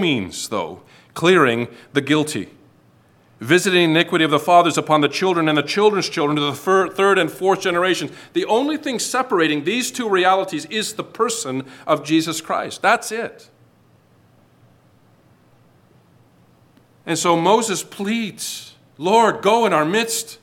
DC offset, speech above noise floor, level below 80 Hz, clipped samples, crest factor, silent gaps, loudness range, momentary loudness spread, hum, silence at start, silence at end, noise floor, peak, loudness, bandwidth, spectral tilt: under 0.1%; 36 dB; -68 dBFS; under 0.1%; 18 dB; none; 7 LU; 11 LU; none; 0 s; 0.05 s; -54 dBFS; -2 dBFS; -18 LUFS; 17 kHz; -4 dB/octave